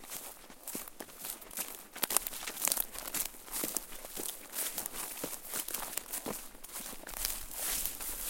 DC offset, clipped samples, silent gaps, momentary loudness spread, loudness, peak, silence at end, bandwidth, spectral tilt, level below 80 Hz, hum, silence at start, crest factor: under 0.1%; under 0.1%; none; 11 LU; -37 LUFS; -4 dBFS; 0 s; 17 kHz; -0.5 dB/octave; -56 dBFS; none; 0 s; 34 dB